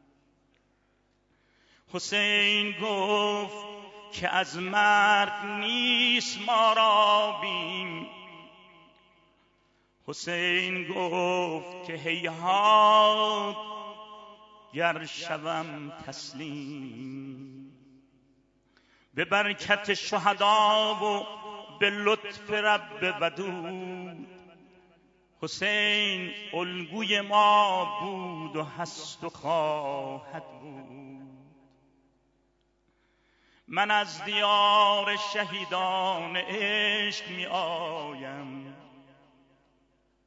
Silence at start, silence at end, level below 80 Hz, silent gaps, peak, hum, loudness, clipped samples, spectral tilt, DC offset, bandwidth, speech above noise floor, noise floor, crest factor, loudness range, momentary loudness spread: 1.95 s; 1.45 s; -74 dBFS; none; -8 dBFS; none; -26 LUFS; under 0.1%; -3 dB/octave; under 0.1%; 8 kHz; 43 dB; -70 dBFS; 20 dB; 10 LU; 20 LU